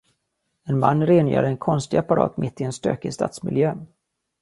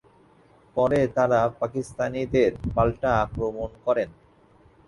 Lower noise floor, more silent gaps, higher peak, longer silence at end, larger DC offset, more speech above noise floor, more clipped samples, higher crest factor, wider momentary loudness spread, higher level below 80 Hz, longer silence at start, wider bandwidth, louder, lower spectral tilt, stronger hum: first, -75 dBFS vs -57 dBFS; neither; first, -2 dBFS vs -6 dBFS; second, 0.55 s vs 0.8 s; neither; first, 54 dB vs 33 dB; neither; about the same, 20 dB vs 18 dB; about the same, 9 LU vs 8 LU; second, -56 dBFS vs -44 dBFS; about the same, 0.65 s vs 0.75 s; about the same, 11.5 kHz vs 11.5 kHz; first, -22 LUFS vs -25 LUFS; about the same, -7.5 dB/octave vs -7 dB/octave; neither